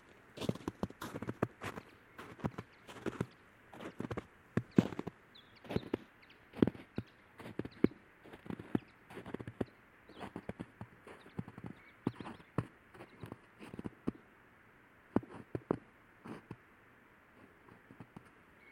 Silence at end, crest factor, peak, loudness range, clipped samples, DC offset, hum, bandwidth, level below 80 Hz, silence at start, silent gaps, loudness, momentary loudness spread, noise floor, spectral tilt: 0 s; 34 dB; -10 dBFS; 8 LU; under 0.1%; under 0.1%; none; 16.5 kHz; -68 dBFS; 0.05 s; none; -42 LUFS; 24 LU; -64 dBFS; -7.5 dB/octave